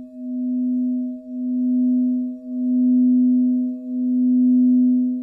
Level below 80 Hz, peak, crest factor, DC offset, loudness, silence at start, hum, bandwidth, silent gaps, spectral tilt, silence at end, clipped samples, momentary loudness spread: -70 dBFS; -12 dBFS; 8 dB; under 0.1%; -19 LUFS; 0 s; none; 0.7 kHz; none; -12 dB/octave; 0 s; under 0.1%; 11 LU